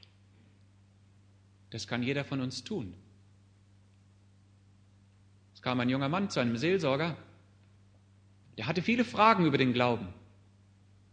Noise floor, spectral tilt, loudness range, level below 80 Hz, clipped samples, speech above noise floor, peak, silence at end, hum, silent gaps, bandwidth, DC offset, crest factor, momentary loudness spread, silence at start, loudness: -61 dBFS; -6 dB/octave; 10 LU; -70 dBFS; under 0.1%; 32 dB; -8 dBFS; 0.95 s; none; none; 9.6 kHz; under 0.1%; 26 dB; 17 LU; 1.7 s; -30 LUFS